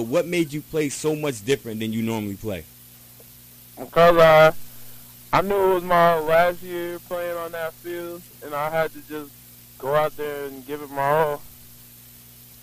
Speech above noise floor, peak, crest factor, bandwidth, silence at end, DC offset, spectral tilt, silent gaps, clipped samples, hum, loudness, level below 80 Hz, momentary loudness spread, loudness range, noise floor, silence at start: 25 dB; -4 dBFS; 20 dB; 15.5 kHz; 0.9 s; under 0.1%; -5 dB/octave; none; under 0.1%; 60 Hz at -50 dBFS; -21 LUFS; -50 dBFS; 19 LU; 10 LU; -47 dBFS; 0 s